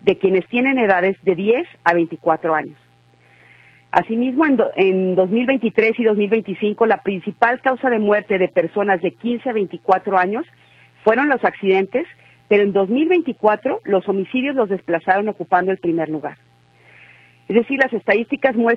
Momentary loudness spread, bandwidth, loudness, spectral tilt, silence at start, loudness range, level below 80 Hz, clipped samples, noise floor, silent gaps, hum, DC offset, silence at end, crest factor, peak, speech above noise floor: 6 LU; 6 kHz; -18 LUFS; -8 dB/octave; 0.05 s; 3 LU; -62 dBFS; under 0.1%; -53 dBFS; none; none; under 0.1%; 0 s; 18 dB; 0 dBFS; 36 dB